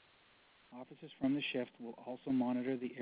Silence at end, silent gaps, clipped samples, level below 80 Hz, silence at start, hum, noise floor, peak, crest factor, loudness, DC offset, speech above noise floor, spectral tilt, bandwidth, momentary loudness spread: 0 s; none; under 0.1%; -78 dBFS; 0.7 s; none; -67 dBFS; -24 dBFS; 16 dB; -39 LUFS; under 0.1%; 29 dB; -4.5 dB/octave; 4 kHz; 18 LU